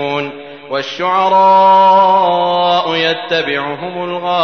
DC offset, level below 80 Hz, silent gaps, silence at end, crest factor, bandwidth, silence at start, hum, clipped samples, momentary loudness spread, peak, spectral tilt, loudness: 0.3%; -64 dBFS; none; 0 s; 10 dB; 6.6 kHz; 0 s; none; under 0.1%; 14 LU; -2 dBFS; -5 dB/octave; -12 LUFS